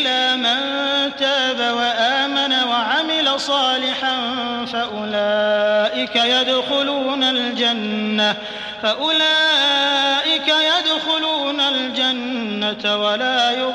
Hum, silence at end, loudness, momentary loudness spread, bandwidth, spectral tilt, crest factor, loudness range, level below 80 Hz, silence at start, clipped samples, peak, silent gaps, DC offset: none; 0 s; -17 LUFS; 7 LU; 12 kHz; -2.5 dB/octave; 12 dB; 3 LU; -62 dBFS; 0 s; under 0.1%; -6 dBFS; none; under 0.1%